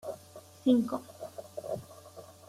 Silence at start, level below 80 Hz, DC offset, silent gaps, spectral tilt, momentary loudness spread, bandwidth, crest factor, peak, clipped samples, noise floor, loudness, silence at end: 0.05 s; -74 dBFS; under 0.1%; none; -6.5 dB/octave; 23 LU; 15 kHz; 22 dB; -12 dBFS; under 0.1%; -53 dBFS; -32 LUFS; 0.15 s